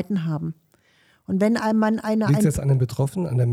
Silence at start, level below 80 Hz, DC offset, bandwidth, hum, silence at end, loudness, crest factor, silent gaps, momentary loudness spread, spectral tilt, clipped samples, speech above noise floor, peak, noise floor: 0 s; -48 dBFS; under 0.1%; 15.5 kHz; none; 0 s; -22 LUFS; 14 dB; none; 8 LU; -7.5 dB/octave; under 0.1%; 39 dB; -8 dBFS; -60 dBFS